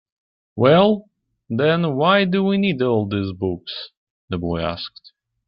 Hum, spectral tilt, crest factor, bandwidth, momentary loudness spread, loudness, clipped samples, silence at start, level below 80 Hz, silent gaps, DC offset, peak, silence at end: none; -11 dB/octave; 18 dB; 5.6 kHz; 16 LU; -19 LUFS; under 0.1%; 0.55 s; -54 dBFS; 3.97-4.28 s; under 0.1%; -4 dBFS; 0.6 s